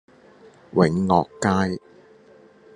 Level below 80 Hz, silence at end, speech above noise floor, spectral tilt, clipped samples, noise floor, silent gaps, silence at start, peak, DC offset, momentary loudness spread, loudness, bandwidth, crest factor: -58 dBFS; 0.95 s; 31 dB; -6.5 dB/octave; under 0.1%; -51 dBFS; none; 0.75 s; -4 dBFS; under 0.1%; 8 LU; -21 LUFS; 10 kHz; 20 dB